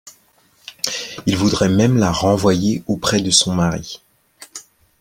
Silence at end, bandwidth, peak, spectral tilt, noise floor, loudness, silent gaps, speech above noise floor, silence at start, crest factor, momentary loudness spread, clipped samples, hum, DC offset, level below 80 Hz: 0.4 s; 16.5 kHz; 0 dBFS; -4.5 dB/octave; -56 dBFS; -17 LUFS; none; 40 dB; 0.05 s; 18 dB; 22 LU; under 0.1%; none; under 0.1%; -46 dBFS